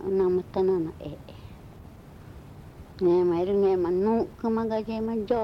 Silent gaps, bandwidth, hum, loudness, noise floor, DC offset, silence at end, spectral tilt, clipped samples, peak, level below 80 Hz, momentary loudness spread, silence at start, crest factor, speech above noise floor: none; 6 kHz; none; -26 LUFS; -46 dBFS; under 0.1%; 0 s; -9 dB/octave; under 0.1%; -14 dBFS; -52 dBFS; 23 LU; 0 s; 14 dB; 21 dB